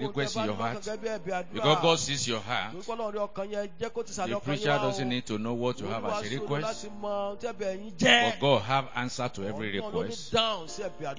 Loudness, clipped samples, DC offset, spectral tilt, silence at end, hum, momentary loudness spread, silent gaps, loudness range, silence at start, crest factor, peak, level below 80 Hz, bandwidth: -29 LUFS; under 0.1%; 0.8%; -4 dB/octave; 0 s; none; 11 LU; none; 4 LU; 0 s; 22 dB; -6 dBFS; -58 dBFS; 7.8 kHz